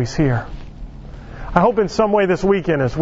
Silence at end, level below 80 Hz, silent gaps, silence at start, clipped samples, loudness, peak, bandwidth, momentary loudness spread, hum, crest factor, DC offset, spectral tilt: 0 s; -34 dBFS; none; 0 s; under 0.1%; -17 LUFS; 0 dBFS; 8 kHz; 21 LU; none; 18 dB; under 0.1%; -7 dB/octave